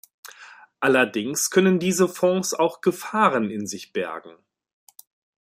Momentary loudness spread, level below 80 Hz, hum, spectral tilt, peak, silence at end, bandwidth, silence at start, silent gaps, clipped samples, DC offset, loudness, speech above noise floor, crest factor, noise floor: 12 LU; -70 dBFS; none; -4 dB/octave; -4 dBFS; 1.2 s; 16 kHz; 0.25 s; none; under 0.1%; under 0.1%; -22 LUFS; 26 dB; 18 dB; -48 dBFS